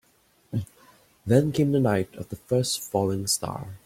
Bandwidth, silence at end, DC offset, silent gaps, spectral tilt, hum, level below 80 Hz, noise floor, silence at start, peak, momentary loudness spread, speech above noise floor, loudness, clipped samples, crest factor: 16.5 kHz; 0.1 s; under 0.1%; none; -5.5 dB/octave; none; -58 dBFS; -63 dBFS; 0.5 s; -8 dBFS; 12 LU; 39 dB; -25 LUFS; under 0.1%; 18 dB